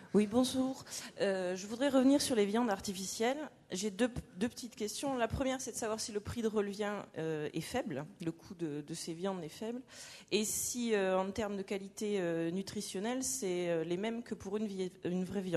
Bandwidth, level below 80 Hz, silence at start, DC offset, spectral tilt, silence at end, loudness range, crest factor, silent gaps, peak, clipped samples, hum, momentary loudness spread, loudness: 13 kHz; -62 dBFS; 0 s; under 0.1%; -4.5 dB/octave; 0 s; 6 LU; 18 dB; none; -18 dBFS; under 0.1%; none; 11 LU; -36 LUFS